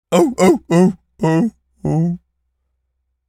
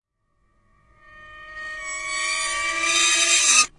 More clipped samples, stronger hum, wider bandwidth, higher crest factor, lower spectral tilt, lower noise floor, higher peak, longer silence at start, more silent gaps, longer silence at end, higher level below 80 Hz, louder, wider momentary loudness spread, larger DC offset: neither; neither; first, 15.5 kHz vs 11.5 kHz; about the same, 16 dB vs 20 dB; first, -7 dB/octave vs 2.5 dB/octave; about the same, -71 dBFS vs -68 dBFS; first, 0 dBFS vs -4 dBFS; second, 0.1 s vs 1.15 s; neither; first, 1.1 s vs 0.1 s; about the same, -50 dBFS vs -54 dBFS; about the same, -16 LUFS vs -18 LUFS; second, 10 LU vs 19 LU; neither